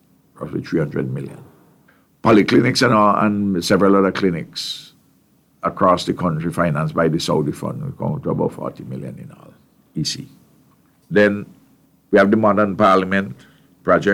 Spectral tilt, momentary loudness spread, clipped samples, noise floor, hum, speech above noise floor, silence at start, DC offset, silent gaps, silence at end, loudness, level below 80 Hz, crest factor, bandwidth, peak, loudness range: -6 dB/octave; 16 LU; under 0.1%; -57 dBFS; none; 40 dB; 0.4 s; under 0.1%; none; 0 s; -18 LUFS; -52 dBFS; 16 dB; 15.5 kHz; -2 dBFS; 8 LU